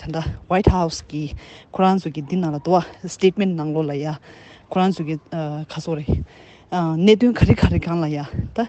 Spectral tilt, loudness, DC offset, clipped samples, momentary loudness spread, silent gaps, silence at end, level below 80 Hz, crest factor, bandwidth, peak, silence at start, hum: -7 dB/octave; -21 LUFS; under 0.1%; under 0.1%; 13 LU; none; 0 s; -34 dBFS; 20 dB; 8.6 kHz; 0 dBFS; 0 s; none